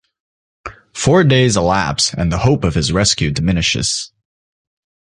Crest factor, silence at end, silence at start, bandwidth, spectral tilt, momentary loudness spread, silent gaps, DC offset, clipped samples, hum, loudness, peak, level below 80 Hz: 16 dB; 1.05 s; 0.65 s; 11.5 kHz; -4.5 dB/octave; 19 LU; none; under 0.1%; under 0.1%; none; -15 LUFS; 0 dBFS; -32 dBFS